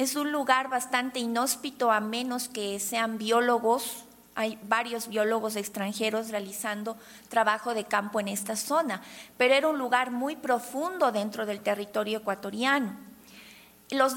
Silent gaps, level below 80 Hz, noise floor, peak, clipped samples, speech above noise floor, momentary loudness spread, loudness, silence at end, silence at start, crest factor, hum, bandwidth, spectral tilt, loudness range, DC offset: none; -72 dBFS; -53 dBFS; -8 dBFS; under 0.1%; 24 dB; 9 LU; -28 LUFS; 0 s; 0 s; 20 dB; none; 17.5 kHz; -3 dB/octave; 3 LU; under 0.1%